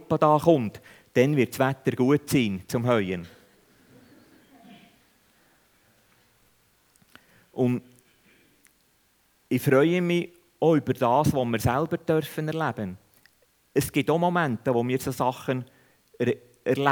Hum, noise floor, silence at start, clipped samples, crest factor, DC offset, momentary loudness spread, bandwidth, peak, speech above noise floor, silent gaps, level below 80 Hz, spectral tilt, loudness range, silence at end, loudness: none; -66 dBFS; 0 s; under 0.1%; 22 dB; under 0.1%; 11 LU; over 20 kHz; -4 dBFS; 42 dB; none; -58 dBFS; -6.5 dB/octave; 11 LU; 0 s; -25 LUFS